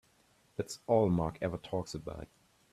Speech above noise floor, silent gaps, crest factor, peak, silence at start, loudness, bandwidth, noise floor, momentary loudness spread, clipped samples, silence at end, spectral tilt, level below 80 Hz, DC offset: 35 dB; none; 20 dB; -14 dBFS; 0.6 s; -34 LUFS; 14 kHz; -69 dBFS; 17 LU; under 0.1%; 0.5 s; -7 dB/octave; -58 dBFS; under 0.1%